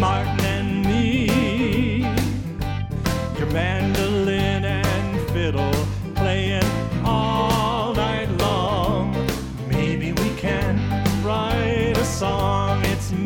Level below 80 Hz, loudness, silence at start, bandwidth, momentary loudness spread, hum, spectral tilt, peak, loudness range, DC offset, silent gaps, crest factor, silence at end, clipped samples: -34 dBFS; -22 LUFS; 0 s; 19 kHz; 4 LU; none; -6 dB/octave; -4 dBFS; 1 LU; under 0.1%; none; 16 dB; 0 s; under 0.1%